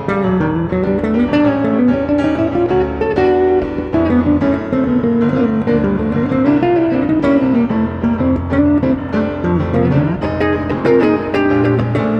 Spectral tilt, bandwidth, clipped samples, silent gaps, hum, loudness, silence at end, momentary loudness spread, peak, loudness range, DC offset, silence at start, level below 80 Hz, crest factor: -9.5 dB/octave; 6.6 kHz; under 0.1%; none; none; -15 LUFS; 0 s; 4 LU; -2 dBFS; 1 LU; under 0.1%; 0 s; -36 dBFS; 12 dB